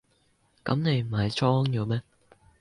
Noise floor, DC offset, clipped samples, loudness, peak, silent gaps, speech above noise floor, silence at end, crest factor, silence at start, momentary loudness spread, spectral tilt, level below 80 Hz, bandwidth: -67 dBFS; under 0.1%; under 0.1%; -27 LUFS; -10 dBFS; none; 42 dB; 0.6 s; 18 dB; 0.65 s; 8 LU; -7 dB/octave; -56 dBFS; 11 kHz